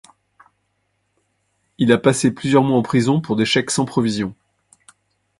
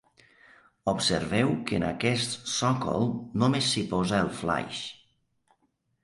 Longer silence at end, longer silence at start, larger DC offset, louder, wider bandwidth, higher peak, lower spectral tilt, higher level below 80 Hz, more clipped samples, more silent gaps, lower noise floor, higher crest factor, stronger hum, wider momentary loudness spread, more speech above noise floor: about the same, 1.05 s vs 1.1 s; first, 1.8 s vs 0.85 s; neither; first, -18 LUFS vs -27 LUFS; about the same, 11.5 kHz vs 11.5 kHz; first, 0 dBFS vs -10 dBFS; about the same, -5 dB/octave vs -4.5 dB/octave; about the same, -56 dBFS vs -54 dBFS; neither; neither; second, -69 dBFS vs -73 dBFS; about the same, 20 dB vs 18 dB; neither; about the same, 6 LU vs 5 LU; first, 52 dB vs 46 dB